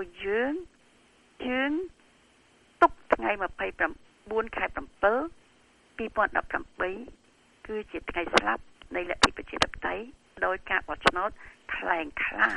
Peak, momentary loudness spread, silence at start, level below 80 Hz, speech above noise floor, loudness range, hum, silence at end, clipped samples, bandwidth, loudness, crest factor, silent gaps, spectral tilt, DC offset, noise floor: -4 dBFS; 13 LU; 0 s; -52 dBFS; 32 dB; 3 LU; none; 0 s; under 0.1%; 11.5 kHz; -29 LUFS; 26 dB; none; -3 dB/octave; under 0.1%; -61 dBFS